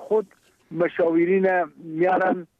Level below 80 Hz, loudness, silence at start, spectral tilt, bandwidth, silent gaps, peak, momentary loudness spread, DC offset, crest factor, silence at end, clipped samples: -72 dBFS; -22 LUFS; 0 s; -8.5 dB/octave; 4.8 kHz; none; -12 dBFS; 11 LU; under 0.1%; 12 dB; 0.15 s; under 0.1%